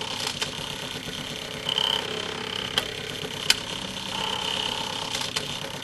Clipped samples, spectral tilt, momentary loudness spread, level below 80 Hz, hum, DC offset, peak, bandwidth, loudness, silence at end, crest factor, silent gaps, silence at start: under 0.1%; -1.5 dB/octave; 8 LU; -54 dBFS; none; under 0.1%; -2 dBFS; 15.5 kHz; -27 LUFS; 0 s; 28 dB; none; 0 s